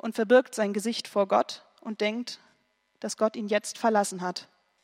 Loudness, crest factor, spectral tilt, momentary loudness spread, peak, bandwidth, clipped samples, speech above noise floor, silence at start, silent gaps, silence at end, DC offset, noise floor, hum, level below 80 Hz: -27 LUFS; 20 dB; -4 dB/octave; 17 LU; -8 dBFS; 16 kHz; under 0.1%; 43 dB; 0.05 s; none; 0.4 s; under 0.1%; -70 dBFS; none; -86 dBFS